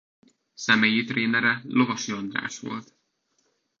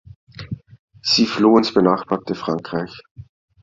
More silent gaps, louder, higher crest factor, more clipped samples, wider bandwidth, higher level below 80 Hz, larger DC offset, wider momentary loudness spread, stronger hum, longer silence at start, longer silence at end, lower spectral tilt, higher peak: second, none vs 0.79-0.88 s, 3.11-3.15 s; second, -24 LUFS vs -18 LUFS; about the same, 22 dB vs 18 dB; neither; about the same, 7.6 kHz vs 7.6 kHz; second, -72 dBFS vs -54 dBFS; neither; second, 14 LU vs 20 LU; neither; first, 0.6 s vs 0.4 s; first, 0.95 s vs 0.4 s; second, -3.5 dB/octave vs -5 dB/octave; about the same, -4 dBFS vs -2 dBFS